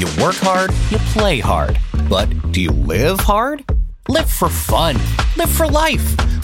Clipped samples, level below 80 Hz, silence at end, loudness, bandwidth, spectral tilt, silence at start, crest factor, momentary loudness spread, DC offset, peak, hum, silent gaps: under 0.1%; -20 dBFS; 0 s; -16 LUFS; 17 kHz; -5 dB/octave; 0 s; 14 dB; 4 LU; under 0.1%; -2 dBFS; none; none